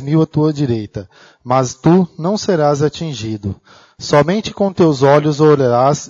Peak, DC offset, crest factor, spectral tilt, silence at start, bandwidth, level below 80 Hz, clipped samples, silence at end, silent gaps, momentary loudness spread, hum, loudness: 0 dBFS; under 0.1%; 14 dB; -6.5 dB/octave; 0 s; 7.8 kHz; -48 dBFS; under 0.1%; 0 s; none; 13 LU; none; -14 LUFS